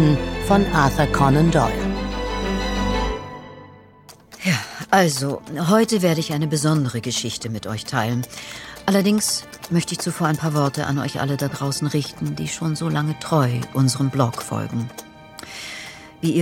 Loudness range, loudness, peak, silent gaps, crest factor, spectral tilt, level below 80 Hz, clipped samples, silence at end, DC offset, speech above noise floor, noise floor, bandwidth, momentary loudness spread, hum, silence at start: 3 LU; -21 LUFS; -2 dBFS; none; 18 dB; -5 dB/octave; -36 dBFS; under 0.1%; 0 s; under 0.1%; 27 dB; -47 dBFS; 17 kHz; 14 LU; none; 0 s